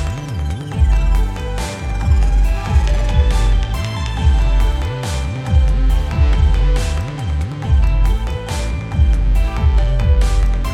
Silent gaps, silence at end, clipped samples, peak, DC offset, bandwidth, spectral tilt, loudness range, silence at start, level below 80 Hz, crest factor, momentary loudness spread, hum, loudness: none; 0 s; under 0.1%; -2 dBFS; under 0.1%; 11.5 kHz; -6 dB/octave; 1 LU; 0 s; -14 dBFS; 12 dB; 7 LU; none; -18 LUFS